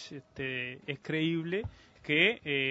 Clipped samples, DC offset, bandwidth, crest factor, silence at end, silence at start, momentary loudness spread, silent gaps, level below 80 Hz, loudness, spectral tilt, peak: under 0.1%; under 0.1%; 8 kHz; 22 dB; 0 s; 0 s; 18 LU; none; -62 dBFS; -31 LUFS; -6 dB/octave; -10 dBFS